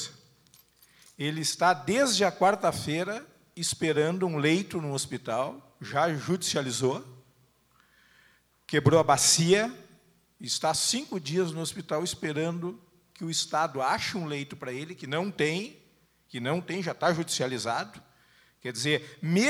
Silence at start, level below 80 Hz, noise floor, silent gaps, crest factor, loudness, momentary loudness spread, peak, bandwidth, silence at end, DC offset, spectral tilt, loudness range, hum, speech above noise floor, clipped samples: 0 s; -66 dBFS; -65 dBFS; none; 22 dB; -28 LUFS; 13 LU; -8 dBFS; 16 kHz; 0 s; under 0.1%; -3.5 dB/octave; 6 LU; none; 37 dB; under 0.1%